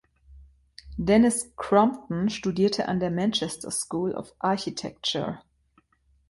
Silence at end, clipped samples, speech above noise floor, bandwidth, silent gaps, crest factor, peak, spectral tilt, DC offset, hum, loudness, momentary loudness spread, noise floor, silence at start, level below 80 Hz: 0.9 s; under 0.1%; 40 dB; 11.5 kHz; none; 20 dB; -6 dBFS; -4.5 dB/octave; under 0.1%; none; -26 LUFS; 10 LU; -65 dBFS; 0.3 s; -52 dBFS